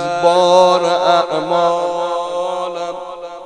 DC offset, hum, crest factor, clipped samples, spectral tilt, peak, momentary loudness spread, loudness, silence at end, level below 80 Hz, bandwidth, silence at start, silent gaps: under 0.1%; none; 16 dB; under 0.1%; -4 dB/octave; 0 dBFS; 14 LU; -15 LUFS; 0 s; -58 dBFS; 10 kHz; 0 s; none